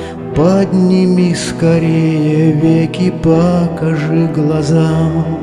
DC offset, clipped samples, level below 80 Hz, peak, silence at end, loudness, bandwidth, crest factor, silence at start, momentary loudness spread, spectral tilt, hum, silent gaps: under 0.1%; under 0.1%; -38 dBFS; 0 dBFS; 0 s; -12 LUFS; 11 kHz; 12 dB; 0 s; 4 LU; -7.5 dB/octave; none; none